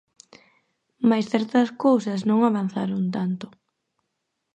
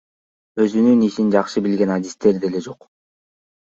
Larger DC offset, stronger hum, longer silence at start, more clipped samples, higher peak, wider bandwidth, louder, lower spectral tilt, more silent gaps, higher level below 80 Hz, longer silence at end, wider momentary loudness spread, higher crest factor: neither; neither; first, 1 s vs 0.55 s; neither; second, -6 dBFS vs -2 dBFS; first, 8.6 kHz vs 7.8 kHz; second, -23 LUFS vs -18 LUFS; about the same, -7.5 dB/octave vs -7 dB/octave; neither; second, -72 dBFS vs -60 dBFS; about the same, 1.1 s vs 1.05 s; second, 8 LU vs 12 LU; about the same, 18 dB vs 18 dB